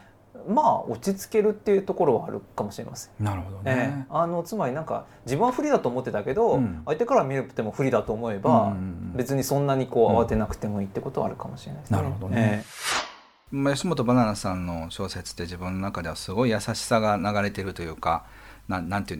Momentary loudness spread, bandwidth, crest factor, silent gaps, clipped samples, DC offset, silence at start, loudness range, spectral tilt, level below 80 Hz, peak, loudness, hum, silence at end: 11 LU; 19.5 kHz; 18 dB; none; under 0.1%; under 0.1%; 0.35 s; 3 LU; -6 dB/octave; -50 dBFS; -6 dBFS; -26 LUFS; none; 0 s